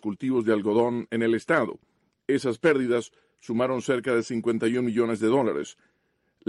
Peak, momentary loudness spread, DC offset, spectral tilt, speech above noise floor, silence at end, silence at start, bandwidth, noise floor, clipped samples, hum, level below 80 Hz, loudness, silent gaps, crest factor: -10 dBFS; 8 LU; under 0.1%; -6 dB/octave; 47 dB; 0.75 s; 0.05 s; 11.5 kHz; -72 dBFS; under 0.1%; none; -68 dBFS; -25 LUFS; none; 16 dB